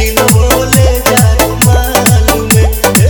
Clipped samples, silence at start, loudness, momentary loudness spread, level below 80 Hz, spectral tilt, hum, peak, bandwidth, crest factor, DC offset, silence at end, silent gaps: 1%; 0 s; -8 LUFS; 1 LU; -14 dBFS; -4.5 dB/octave; none; 0 dBFS; over 20 kHz; 8 dB; under 0.1%; 0 s; none